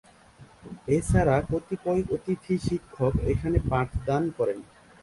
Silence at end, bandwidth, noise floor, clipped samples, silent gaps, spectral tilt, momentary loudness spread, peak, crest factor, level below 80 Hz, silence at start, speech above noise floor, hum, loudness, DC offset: 0.4 s; 11.5 kHz; -53 dBFS; under 0.1%; none; -7.5 dB/octave; 8 LU; -10 dBFS; 18 dB; -38 dBFS; 0.4 s; 27 dB; none; -27 LUFS; under 0.1%